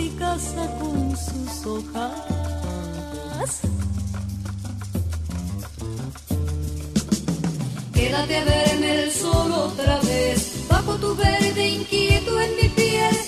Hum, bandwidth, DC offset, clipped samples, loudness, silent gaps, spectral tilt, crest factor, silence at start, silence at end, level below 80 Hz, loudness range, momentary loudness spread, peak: none; 14 kHz; under 0.1%; under 0.1%; -23 LUFS; none; -4.5 dB/octave; 20 dB; 0 s; 0 s; -32 dBFS; 8 LU; 12 LU; -4 dBFS